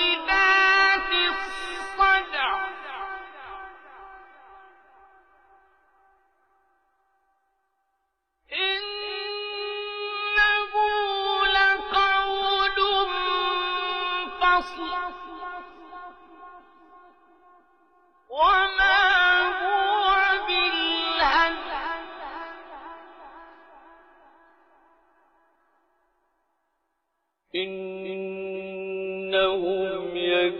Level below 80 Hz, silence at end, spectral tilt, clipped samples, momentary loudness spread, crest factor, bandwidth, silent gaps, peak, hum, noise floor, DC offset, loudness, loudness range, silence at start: -52 dBFS; 0 s; -3 dB/octave; under 0.1%; 19 LU; 18 dB; 10 kHz; none; -8 dBFS; none; -78 dBFS; under 0.1%; -23 LUFS; 18 LU; 0 s